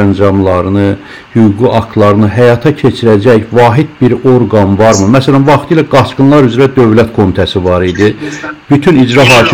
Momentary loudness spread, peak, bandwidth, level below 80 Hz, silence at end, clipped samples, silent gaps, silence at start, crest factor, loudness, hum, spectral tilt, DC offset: 5 LU; 0 dBFS; 16.5 kHz; -36 dBFS; 0 s; 10%; none; 0 s; 6 dB; -7 LUFS; none; -6.5 dB/octave; 1%